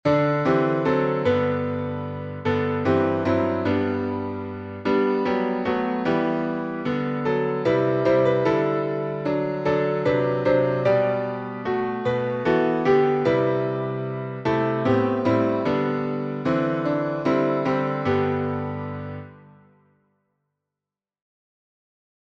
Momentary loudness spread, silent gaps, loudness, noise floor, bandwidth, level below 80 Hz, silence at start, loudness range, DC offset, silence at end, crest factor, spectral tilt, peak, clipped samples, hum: 8 LU; none; -23 LUFS; -89 dBFS; 7.2 kHz; -56 dBFS; 0.05 s; 4 LU; under 0.1%; 2.85 s; 18 dB; -8.5 dB/octave; -6 dBFS; under 0.1%; 50 Hz at -60 dBFS